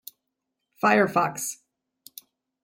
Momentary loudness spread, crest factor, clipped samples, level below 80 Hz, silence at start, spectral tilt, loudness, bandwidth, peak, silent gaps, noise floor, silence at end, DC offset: 25 LU; 22 dB; under 0.1%; -72 dBFS; 0.85 s; -4 dB/octave; -23 LUFS; 16.5 kHz; -6 dBFS; none; -82 dBFS; 1.1 s; under 0.1%